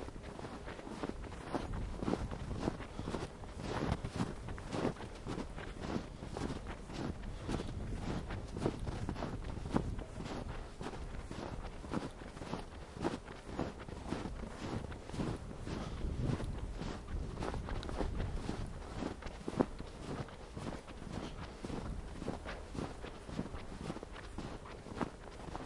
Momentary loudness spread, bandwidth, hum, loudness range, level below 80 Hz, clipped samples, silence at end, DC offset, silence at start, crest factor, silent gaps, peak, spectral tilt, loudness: 8 LU; 11.5 kHz; none; 4 LU; -48 dBFS; under 0.1%; 0 s; under 0.1%; 0 s; 26 dB; none; -14 dBFS; -6.5 dB/octave; -43 LUFS